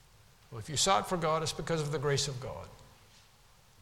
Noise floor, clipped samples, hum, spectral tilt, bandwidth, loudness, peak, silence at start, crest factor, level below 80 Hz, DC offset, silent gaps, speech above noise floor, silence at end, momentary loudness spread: -62 dBFS; under 0.1%; none; -3.5 dB/octave; 17 kHz; -31 LUFS; -14 dBFS; 0.5 s; 22 dB; -58 dBFS; under 0.1%; none; 30 dB; 0.95 s; 19 LU